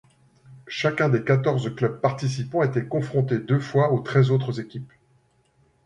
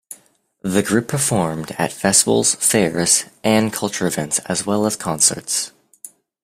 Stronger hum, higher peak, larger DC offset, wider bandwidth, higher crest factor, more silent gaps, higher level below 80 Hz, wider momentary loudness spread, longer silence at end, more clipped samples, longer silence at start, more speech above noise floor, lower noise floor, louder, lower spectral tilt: neither; second, -6 dBFS vs 0 dBFS; neither; second, 9.4 kHz vs 16 kHz; about the same, 18 dB vs 20 dB; neither; second, -62 dBFS vs -54 dBFS; about the same, 9 LU vs 7 LU; first, 1 s vs 0.35 s; neither; first, 0.5 s vs 0.1 s; first, 41 dB vs 37 dB; first, -63 dBFS vs -55 dBFS; second, -23 LUFS vs -17 LUFS; first, -7.5 dB/octave vs -3 dB/octave